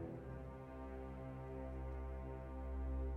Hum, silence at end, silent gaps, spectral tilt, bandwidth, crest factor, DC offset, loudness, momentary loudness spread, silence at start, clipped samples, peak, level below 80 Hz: none; 0 s; none; -9.5 dB/octave; 3.9 kHz; 12 dB; under 0.1%; -49 LUFS; 6 LU; 0 s; under 0.1%; -34 dBFS; -48 dBFS